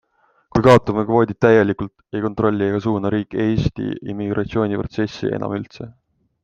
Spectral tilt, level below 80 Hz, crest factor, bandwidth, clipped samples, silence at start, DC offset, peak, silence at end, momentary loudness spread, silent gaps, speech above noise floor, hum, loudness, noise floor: -7.5 dB/octave; -44 dBFS; 20 dB; 9.8 kHz; under 0.1%; 0.55 s; under 0.1%; 0 dBFS; 0.55 s; 13 LU; none; 35 dB; none; -19 LUFS; -54 dBFS